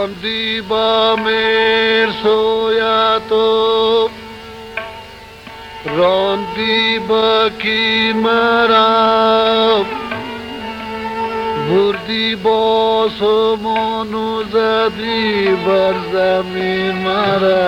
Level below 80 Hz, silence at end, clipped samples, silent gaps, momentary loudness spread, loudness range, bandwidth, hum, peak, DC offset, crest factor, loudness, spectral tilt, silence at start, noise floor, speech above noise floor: -46 dBFS; 0 s; under 0.1%; none; 14 LU; 5 LU; 10.5 kHz; none; -2 dBFS; under 0.1%; 14 dB; -14 LUFS; -5.5 dB/octave; 0 s; -35 dBFS; 21 dB